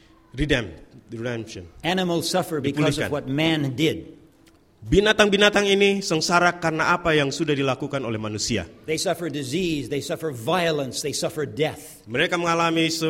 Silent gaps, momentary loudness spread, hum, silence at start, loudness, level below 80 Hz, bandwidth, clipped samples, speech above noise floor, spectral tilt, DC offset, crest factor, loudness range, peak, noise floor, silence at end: none; 12 LU; none; 0.35 s; -22 LUFS; -44 dBFS; 16.5 kHz; under 0.1%; 33 dB; -4 dB/octave; under 0.1%; 22 dB; 6 LU; 0 dBFS; -56 dBFS; 0 s